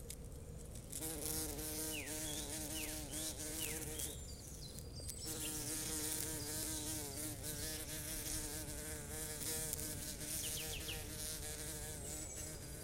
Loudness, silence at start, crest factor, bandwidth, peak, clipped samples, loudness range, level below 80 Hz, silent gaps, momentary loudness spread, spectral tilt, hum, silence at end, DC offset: -43 LUFS; 0 s; 24 dB; 17 kHz; -20 dBFS; under 0.1%; 2 LU; -54 dBFS; none; 8 LU; -2.5 dB/octave; none; 0 s; under 0.1%